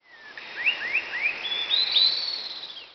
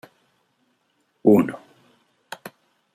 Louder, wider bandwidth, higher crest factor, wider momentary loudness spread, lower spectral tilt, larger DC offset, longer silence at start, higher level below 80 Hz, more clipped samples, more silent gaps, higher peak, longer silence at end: second, -23 LUFS vs -19 LUFS; second, 6.4 kHz vs 15.5 kHz; about the same, 18 dB vs 22 dB; second, 18 LU vs 24 LU; second, 5 dB/octave vs -8 dB/octave; neither; second, 0.1 s vs 1.25 s; about the same, -72 dBFS vs -68 dBFS; neither; neither; second, -8 dBFS vs -4 dBFS; second, 0 s vs 0.45 s